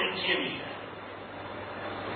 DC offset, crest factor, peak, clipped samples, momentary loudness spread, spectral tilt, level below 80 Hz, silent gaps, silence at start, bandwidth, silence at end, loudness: under 0.1%; 18 dB; -16 dBFS; under 0.1%; 14 LU; -8 dB/octave; -62 dBFS; none; 0 s; 4.6 kHz; 0 s; -34 LUFS